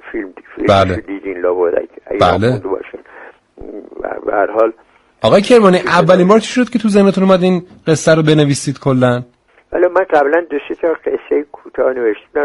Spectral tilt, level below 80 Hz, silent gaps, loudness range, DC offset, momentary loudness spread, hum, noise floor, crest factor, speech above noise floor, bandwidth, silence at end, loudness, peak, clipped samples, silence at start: -6 dB/octave; -46 dBFS; none; 7 LU; under 0.1%; 15 LU; none; -38 dBFS; 14 dB; 27 dB; 11.5 kHz; 0 s; -13 LUFS; 0 dBFS; under 0.1%; 0.05 s